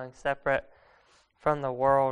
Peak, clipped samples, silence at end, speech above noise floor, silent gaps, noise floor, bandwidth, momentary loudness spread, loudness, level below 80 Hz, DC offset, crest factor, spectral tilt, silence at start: -10 dBFS; under 0.1%; 0 s; 35 dB; none; -63 dBFS; 10.5 kHz; 7 LU; -29 LUFS; -56 dBFS; under 0.1%; 18 dB; -7 dB/octave; 0 s